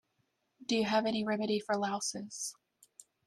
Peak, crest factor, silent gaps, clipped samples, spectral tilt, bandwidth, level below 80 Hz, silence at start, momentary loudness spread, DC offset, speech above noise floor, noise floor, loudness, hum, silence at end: -18 dBFS; 18 dB; none; under 0.1%; -3.5 dB/octave; 13 kHz; -78 dBFS; 0.6 s; 10 LU; under 0.1%; 46 dB; -79 dBFS; -34 LUFS; none; 0.75 s